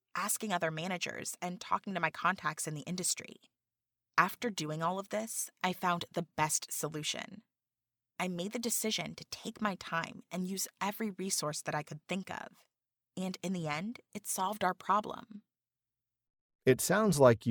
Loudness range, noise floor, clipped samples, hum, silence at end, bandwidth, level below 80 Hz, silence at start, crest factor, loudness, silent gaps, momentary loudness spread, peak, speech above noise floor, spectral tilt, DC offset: 4 LU; under -90 dBFS; under 0.1%; none; 0 s; over 20 kHz; -72 dBFS; 0.15 s; 26 dB; -34 LUFS; 16.30-16.34 s, 16.41-16.49 s, 16.55-16.59 s; 11 LU; -10 dBFS; over 55 dB; -3.5 dB/octave; under 0.1%